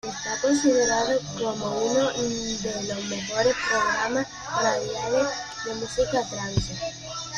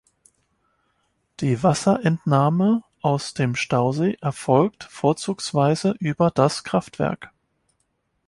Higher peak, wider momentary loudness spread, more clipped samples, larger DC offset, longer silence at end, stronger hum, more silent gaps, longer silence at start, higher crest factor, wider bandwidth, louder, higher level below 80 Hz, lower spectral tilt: second, -10 dBFS vs -4 dBFS; about the same, 8 LU vs 7 LU; neither; neither; second, 0 s vs 1 s; neither; neither; second, 0.05 s vs 1.4 s; about the same, 16 dB vs 18 dB; about the same, 11 kHz vs 11.5 kHz; second, -25 LUFS vs -22 LUFS; first, -48 dBFS vs -58 dBFS; second, -3.5 dB/octave vs -6.5 dB/octave